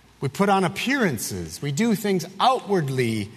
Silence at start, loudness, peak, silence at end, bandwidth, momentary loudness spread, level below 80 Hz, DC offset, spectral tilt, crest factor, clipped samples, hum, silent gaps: 0.2 s; -23 LUFS; -6 dBFS; 0 s; 13.5 kHz; 8 LU; -58 dBFS; under 0.1%; -5 dB/octave; 18 dB; under 0.1%; none; none